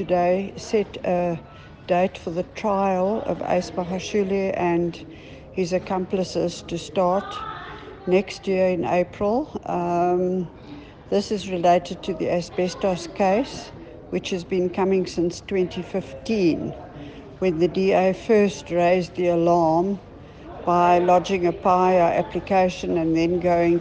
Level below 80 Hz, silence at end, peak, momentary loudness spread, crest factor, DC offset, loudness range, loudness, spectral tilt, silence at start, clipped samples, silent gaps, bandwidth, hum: -50 dBFS; 0 s; -6 dBFS; 14 LU; 16 dB; under 0.1%; 5 LU; -22 LUFS; -6.5 dB/octave; 0 s; under 0.1%; none; 9.2 kHz; none